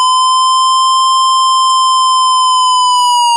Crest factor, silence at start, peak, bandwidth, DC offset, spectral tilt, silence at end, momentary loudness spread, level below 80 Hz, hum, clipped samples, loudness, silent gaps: 4 dB; 0 s; -4 dBFS; 11.5 kHz; under 0.1%; 12 dB/octave; 0 s; 0 LU; under -90 dBFS; none; under 0.1%; -9 LUFS; none